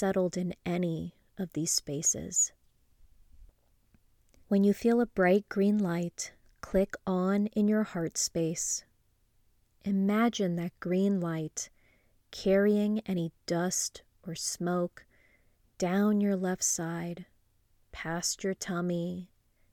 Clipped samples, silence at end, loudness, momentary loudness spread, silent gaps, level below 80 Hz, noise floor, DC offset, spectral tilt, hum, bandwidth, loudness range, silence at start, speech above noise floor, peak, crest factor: under 0.1%; 0.5 s; -30 LUFS; 13 LU; none; -60 dBFS; -69 dBFS; under 0.1%; -4.5 dB/octave; none; 17.5 kHz; 3 LU; 0 s; 40 dB; -14 dBFS; 16 dB